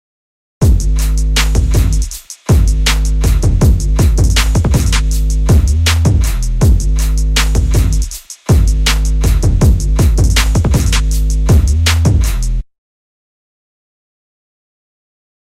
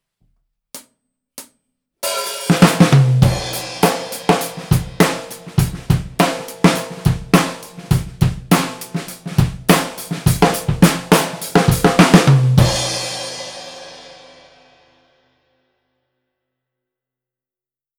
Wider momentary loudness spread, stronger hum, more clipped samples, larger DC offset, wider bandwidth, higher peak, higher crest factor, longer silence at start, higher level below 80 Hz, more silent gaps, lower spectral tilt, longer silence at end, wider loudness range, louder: second, 5 LU vs 17 LU; neither; neither; neither; second, 15.5 kHz vs over 20 kHz; about the same, 0 dBFS vs 0 dBFS; second, 12 dB vs 18 dB; second, 0.6 s vs 0.75 s; first, -12 dBFS vs -34 dBFS; neither; about the same, -5 dB/octave vs -5.5 dB/octave; second, 2.8 s vs 3.85 s; about the same, 4 LU vs 5 LU; first, -13 LUFS vs -16 LUFS